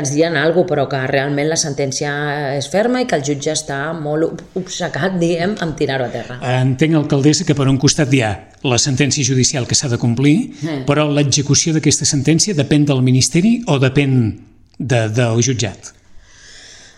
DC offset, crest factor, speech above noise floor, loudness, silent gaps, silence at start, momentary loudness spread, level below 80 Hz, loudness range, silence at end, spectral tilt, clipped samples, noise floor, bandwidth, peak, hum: under 0.1%; 16 dB; 25 dB; -16 LUFS; none; 0 s; 8 LU; -44 dBFS; 5 LU; 0.2 s; -4.5 dB/octave; under 0.1%; -40 dBFS; 12 kHz; 0 dBFS; none